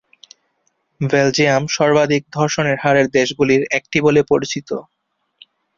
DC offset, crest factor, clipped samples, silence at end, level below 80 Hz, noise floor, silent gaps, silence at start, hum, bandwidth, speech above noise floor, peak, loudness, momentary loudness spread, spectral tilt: under 0.1%; 16 dB; under 0.1%; 0.95 s; -54 dBFS; -67 dBFS; none; 1 s; none; 7.6 kHz; 51 dB; -2 dBFS; -16 LUFS; 9 LU; -5 dB/octave